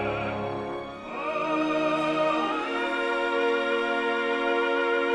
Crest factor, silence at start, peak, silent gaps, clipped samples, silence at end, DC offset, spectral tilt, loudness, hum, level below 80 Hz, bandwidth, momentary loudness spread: 12 dB; 0 s; -14 dBFS; none; under 0.1%; 0 s; under 0.1%; -5 dB/octave; -26 LUFS; none; -58 dBFS; 10.5 kHz; 8 LU